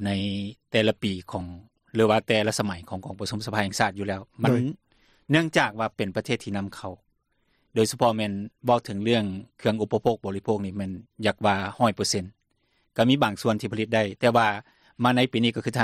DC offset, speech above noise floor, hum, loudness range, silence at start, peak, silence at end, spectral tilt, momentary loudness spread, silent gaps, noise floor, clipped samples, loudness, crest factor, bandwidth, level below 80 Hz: under 0.1%; 45 dB; none; 3 LU; 0 s; -6 dBFS; 0 s; -5 dB/octave; 11 LU; none; -70 dBFS; under 0.1%; -25 LUFS; 20 dB; 14.5 kHz; -62 dBFS